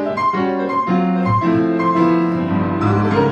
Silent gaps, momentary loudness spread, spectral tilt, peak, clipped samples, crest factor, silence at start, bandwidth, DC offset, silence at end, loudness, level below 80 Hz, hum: none; 4 LU; -9 dB/octave; -4 dBFS; under 0.1%; 12 dB; 0 s; 7.8 kHz; under 0.1%; 0 s; -17 LUFS; -48 dBFS; none